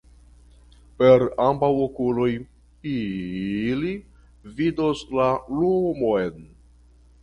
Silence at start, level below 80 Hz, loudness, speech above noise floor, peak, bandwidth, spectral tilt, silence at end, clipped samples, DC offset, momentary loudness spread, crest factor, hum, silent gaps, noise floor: 1 s; -50 dBFS; -23 LUFS; 31 dB; -4 dBFS; 9.2 kHz; -8 dB/octave; 0.75 s; under 0.1%; under 0.1%; 13 LU; 20 dB; 60 Hz at -50 dBFS; none; -53 dBFS